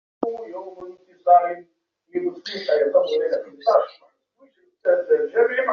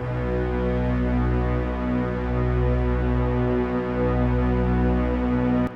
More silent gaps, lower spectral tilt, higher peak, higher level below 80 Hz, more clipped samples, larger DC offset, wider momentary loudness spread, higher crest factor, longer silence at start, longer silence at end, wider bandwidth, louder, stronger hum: neither; second, -1 dB/octave vs -10 dB/octave; first, -4 dBFS vs -12 dBFS; second, -74 dBFS vs -28 dBFS; neither; neither; first, 18 LU vs 3 LU; first, 18 dB vs 10 dB; first, 0.2 s vs 0 s; about the same, 0 s vs 0 s; first, 6.6 kHz vs 5.4 kHz; first, -21 LUFS vs -24 LUFS; neither